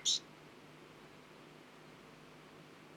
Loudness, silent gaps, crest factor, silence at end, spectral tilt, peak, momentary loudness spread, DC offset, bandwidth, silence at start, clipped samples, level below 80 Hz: -35 LUFS; none; 24 dB; 0 s; -0.5 dB/octave; -22 dBFS; 15 LU; under 0.1%; 19 kHz; 0 s; under 0.1%; -80 dBFS